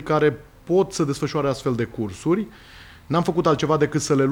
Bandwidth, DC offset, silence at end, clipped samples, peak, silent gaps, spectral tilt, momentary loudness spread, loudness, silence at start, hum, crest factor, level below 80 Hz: 18 kHz; under 0.1%; 0 s; under 0.1%; -6 dBFS; none; -6 dB/octave; 6 LU; -22 LUFS; 0 s; none; 16 dB; -50 dBFS